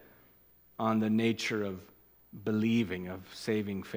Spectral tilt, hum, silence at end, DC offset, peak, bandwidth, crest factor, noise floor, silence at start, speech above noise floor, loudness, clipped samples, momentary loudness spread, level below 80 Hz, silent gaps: -6 dB/octave; 60 Hz at -65 dBFS; 0 s; under 0.1%; -16 dBFS; 16 kHz; 18 dB; -63 dBFS; 0.8 s; 31 dB; -32 LUFS; under 0.1%; 14 LU; -70 dBFS; none